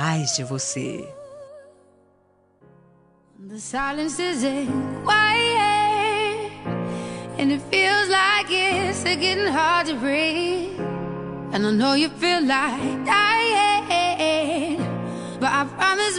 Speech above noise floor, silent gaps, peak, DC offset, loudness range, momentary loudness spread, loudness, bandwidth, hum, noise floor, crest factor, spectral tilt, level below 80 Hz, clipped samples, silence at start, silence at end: 39 dB; none; -4 dBFS; under 0.1%; 10 LU; 12 LU; -21 LUFS; 11 kHz; none; -60 dBFS; 18 dB; -3.5 dB/octave; -56 dBFS; under 0.1%; 0 s; 0 s